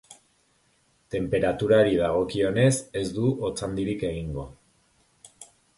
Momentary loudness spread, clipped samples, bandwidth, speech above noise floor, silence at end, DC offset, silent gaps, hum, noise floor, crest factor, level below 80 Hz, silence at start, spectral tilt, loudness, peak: 13 LU; under 0.1%; 11.5 kHz; 42 dB; 0.35 s; under 0.1%; none; none; -66 dBFS; 20 dB; -48 dBFS; 0.1 s; -6 dB/octave; -25 LUFS; -6 dBFS